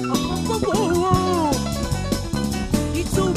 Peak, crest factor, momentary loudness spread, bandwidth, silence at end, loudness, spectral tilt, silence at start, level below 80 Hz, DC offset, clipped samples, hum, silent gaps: -4 dBFS; 16 dB; 5 LU; 15.5 kHz; 0 s; -22 LUFS; -5.5 dB/octave; 0 s; -32 dBFS; under 0.1%; under 0.1%; none; none